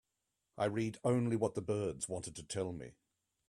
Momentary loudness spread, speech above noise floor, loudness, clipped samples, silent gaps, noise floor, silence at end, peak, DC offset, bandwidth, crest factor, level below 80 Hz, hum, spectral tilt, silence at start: 10 LU; 50 dB; -37 LUFS; under 0.1%; none; -87 dBFS; 0.6 s; -20 dBFS; under 0.1%; 13 kHz; 18 dB; -68 dBFS; none; -6 dB/octave; 0.55 s